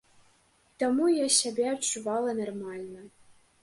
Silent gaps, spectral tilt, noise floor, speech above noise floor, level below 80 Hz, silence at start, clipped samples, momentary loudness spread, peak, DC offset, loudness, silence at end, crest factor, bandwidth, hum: none; -2 dB/octave; -65 dBFS; 37 dB; -74 dBFS; 0.8 s; under 0.1%; 17 LU; -10 dBFS; under 0.1%; -27 LUFS; 0.55 s; 20 dB; 11.5 kHz; none